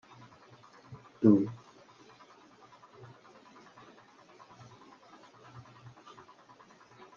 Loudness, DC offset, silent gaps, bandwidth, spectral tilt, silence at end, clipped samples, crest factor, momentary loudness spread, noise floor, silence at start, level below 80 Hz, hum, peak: -27 LUFS; under 0.1%; none; 7 kHz; -9 dB/octave; 5.6 s; under 0.1%; 28 dB; 29 LU; -58 dBFS; 0.9 s; -78 dBFS; none; -10 dBFS